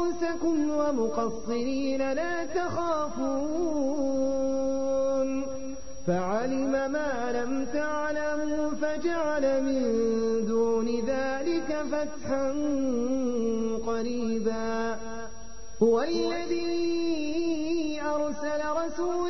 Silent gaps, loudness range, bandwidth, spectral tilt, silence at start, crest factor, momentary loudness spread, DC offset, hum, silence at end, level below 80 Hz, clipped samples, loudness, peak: none; 2 LU; 6.4 kHz; -5.5 dB/octave; 0 s; 16 dB; 4 LU; 2%; none; 0 s; -52 dBFS; under 0.1%; -29 LUFS; -12 dBFS